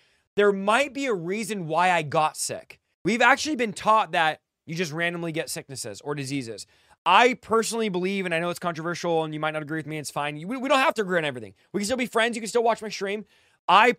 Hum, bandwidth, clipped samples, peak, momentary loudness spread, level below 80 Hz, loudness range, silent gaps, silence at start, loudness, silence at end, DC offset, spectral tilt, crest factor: none; 16 kHz; under 0.1%; -4 dBFS; 12 LU; -68 dBFS; 3 LU; 2.94-3.05 s, 6.98-7.05 s, 13.59-13.68 s; 0.35 s; -25 LUFS; 0.05 s; under 0.1%; -4 dB/octave; 22 dB